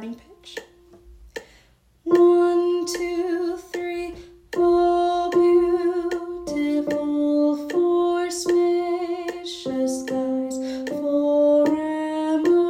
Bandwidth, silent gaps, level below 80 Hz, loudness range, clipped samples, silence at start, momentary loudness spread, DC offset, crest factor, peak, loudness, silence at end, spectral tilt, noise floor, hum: 14.5 kHz; none; -54 dBFS; 2 LU; under 0.1%; 0 s; 16 LU; under 0.1%; 14 dB; -8 dBFS; -22 LUFS; 0 s; -4.5 dB/octave; -57 dBFS; none